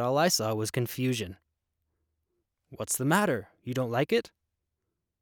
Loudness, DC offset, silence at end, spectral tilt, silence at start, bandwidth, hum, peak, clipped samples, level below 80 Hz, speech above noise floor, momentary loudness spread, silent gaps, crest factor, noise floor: -28 LUFS; under 0.1%; 0.95 s; -4.5 dB/octave; 0 s; over 20 kHz; none; -12 dBFS; under 0.1%; -68 dBFS; 55 dB; 10 LU; none; 20 dB; -84 dBFS